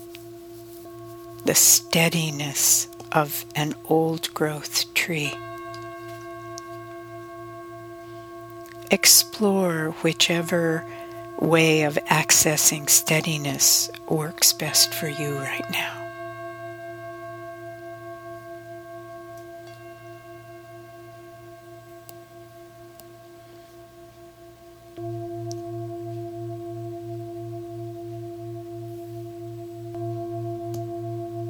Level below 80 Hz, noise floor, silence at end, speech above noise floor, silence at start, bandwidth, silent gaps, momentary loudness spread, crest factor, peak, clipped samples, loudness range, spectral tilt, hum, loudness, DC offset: -62 dBFS; -47 dBFS; 0 s; 25 dB; 0 s; over 20 kHz; none; 24 LU; 24 dB; -2 dBFS; under 0.1%; 22 LU; -2.5 dB/octave; none; -21 LUFS; under 0.1%